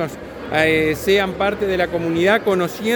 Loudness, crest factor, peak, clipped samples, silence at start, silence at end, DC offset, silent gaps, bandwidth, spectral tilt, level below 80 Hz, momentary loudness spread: -18 LUFS; 16 dB; -2 dBFS; under 0.1%; 0 s; 0 s; under 0.1%; none; 19.5 kHz; -5 dB/octave; -42 dBFS; 6 LU